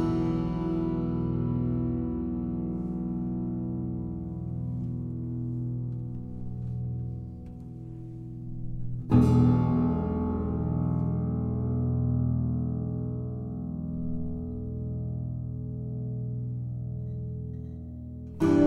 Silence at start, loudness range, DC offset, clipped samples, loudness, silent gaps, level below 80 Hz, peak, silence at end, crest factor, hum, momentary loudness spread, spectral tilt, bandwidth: 0 s; 9 LU; under 0.1%; under 0.1%; -30 LUFS; none; -42 dBFS; -10 dBFS; 0 s; 20 dB; 60 Hz at -55 dBFS; 13 LU; -10.5 dB/octave; 6 kHz